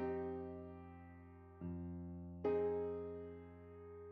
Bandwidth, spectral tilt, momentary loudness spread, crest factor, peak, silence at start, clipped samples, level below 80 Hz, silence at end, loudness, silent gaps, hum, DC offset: 4.7 kHz; -8.5 dB/octave; 18 LU; 16 dB; -28 dBFS; 0 s; under 0.1%; -66 dBFS; 0 s; -45 LUFS; none; none; under 0.1%